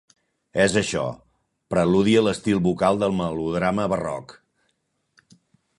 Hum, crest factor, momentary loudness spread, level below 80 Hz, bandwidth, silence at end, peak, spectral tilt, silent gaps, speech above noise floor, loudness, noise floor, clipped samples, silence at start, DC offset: none; 18 dB; 10 LU; -50 dBFS; 11.5 kHz; 1.45 s; -4 dBFS; -5.5 dB/octave; none; 51 dB; -22 LUFS; -73 dBFS; under 0.1%; 0.55 s; under 0.1%